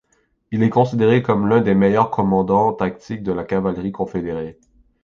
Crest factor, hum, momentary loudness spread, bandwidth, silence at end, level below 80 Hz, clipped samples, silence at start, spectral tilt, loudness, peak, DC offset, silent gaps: 16 dB; none; 11 LU; 7 kHz; 0.5 s; -48 dBFS; under 0.1%; 0.5 s; -9 dB/octave; -18 LUFS; -2 dBFS; under 0.1%; none